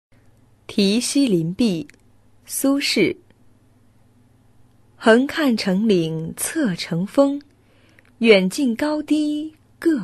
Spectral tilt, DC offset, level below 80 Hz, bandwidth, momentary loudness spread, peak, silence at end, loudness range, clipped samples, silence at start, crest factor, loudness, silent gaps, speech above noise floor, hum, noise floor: -4.5 dB/octave; under 0.1%; -58 dBFS; 12.5 kHz; 12 LU; -2 dBFS; 0 s; 4 LU; under 0.1%; 0.7 s; 20 dB; -19 LUFS; none; 36 dB; none; -54 dBFS